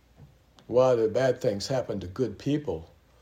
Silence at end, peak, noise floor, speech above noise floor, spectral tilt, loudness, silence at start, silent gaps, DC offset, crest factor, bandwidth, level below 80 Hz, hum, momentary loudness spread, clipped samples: 0.35 s; -10 dBFS; -55 dBFS; 29 dB; -6 dB/octave; -27 LUFS; 0.2 s; none; under 0.1%; 16 dB; 15 kHz; -60 dBFS; none; 11 LU; under 0.1%